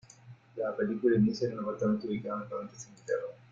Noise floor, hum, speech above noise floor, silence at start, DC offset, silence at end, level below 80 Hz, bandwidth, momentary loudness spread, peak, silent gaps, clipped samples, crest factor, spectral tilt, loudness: -54 dBFS; none; 23 dB; 0.25 s; under 0.1%; 0.15 s; -68 dBFS; 7.6 kHz; 14 LU; -14 dBFS; none; under 0.1%; 18 dB; -7 dB/octave; -32 LUFS